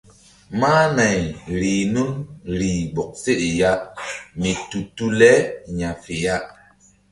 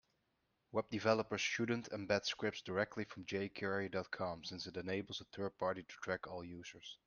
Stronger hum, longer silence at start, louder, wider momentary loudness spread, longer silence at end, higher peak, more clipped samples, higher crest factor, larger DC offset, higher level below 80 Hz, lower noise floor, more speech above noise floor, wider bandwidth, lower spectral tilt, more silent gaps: neither; second, 0.5 s vs 0.75 s; first, -20 LUFS vs -41 LUFS; first, 14 LU vs 10 LU; first, 0.65 s vs 0.1 s; first, 0 dBFS vs -18 dBFS; neither; about the same, 20 dB vs 24 dB; neither; first, -44 dBFS vs -76 dBFS; second, -54 dBFS vs -83 dBFS; second, 34 dB vs 42 dB; first, 11.5 kHz vs 10 kHz; about the same, -5 dB/octave vs -4.5 dB/octave; neither